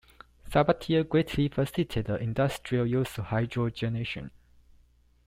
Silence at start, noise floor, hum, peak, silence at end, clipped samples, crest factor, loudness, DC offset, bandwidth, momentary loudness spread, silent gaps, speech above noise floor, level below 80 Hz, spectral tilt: 0.45 s; -62 dBFS; 60 Hz at -45 dBFS; -12 dBFS; 1 s; under 0.1%; 18 dB; -29 LUFS; under 0.1%; 16 kHz; 7 LU; none; 34 dB; -50 dBFS; -7 dB/octave